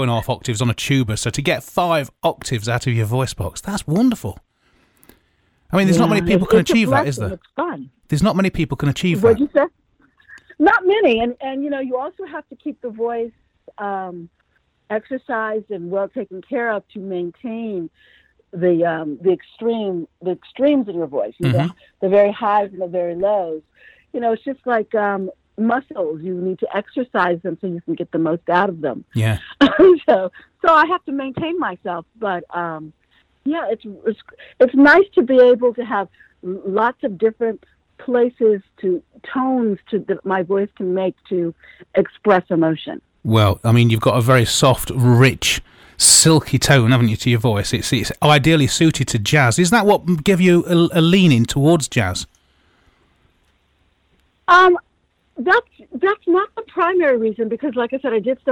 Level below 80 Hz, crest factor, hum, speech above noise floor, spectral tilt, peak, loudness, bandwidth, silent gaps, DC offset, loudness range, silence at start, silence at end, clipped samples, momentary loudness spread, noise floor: -46 dBFS; 16 dB; none; 47 dB; -5 dB/octave; -2 dBFS; -17 LUFS; 19 kHz; none; under 0.1%; 10 LU; 0 s; 0 s; under 0.1%; 14 LU; -64 dBFS